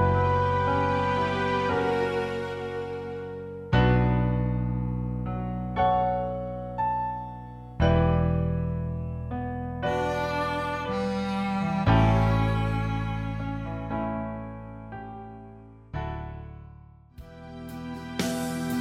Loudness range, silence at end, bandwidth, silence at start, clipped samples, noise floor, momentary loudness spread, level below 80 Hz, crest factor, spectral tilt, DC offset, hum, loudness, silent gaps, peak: 10 LU; 0 s; 15.5 kHz; 0 s; under 0.1%; -49 dBFS; 17 LU; -38 dBFS; 16 dB; -7 dB/octave; under 0.1%; none; -27 LUFS; none; -10 dBFS